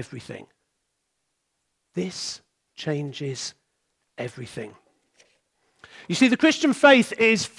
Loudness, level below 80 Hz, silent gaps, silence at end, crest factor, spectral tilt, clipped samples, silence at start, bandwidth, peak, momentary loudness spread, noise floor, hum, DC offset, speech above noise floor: -21 LUFS; -72 dBFS; none; 0.1 s; 22 dB; -4 dB/octave; under 0.1%; 0 s; 12 kHz; -4 dBFS; 22 LU; -77 dBFS; none; under 0.1%; 54 dB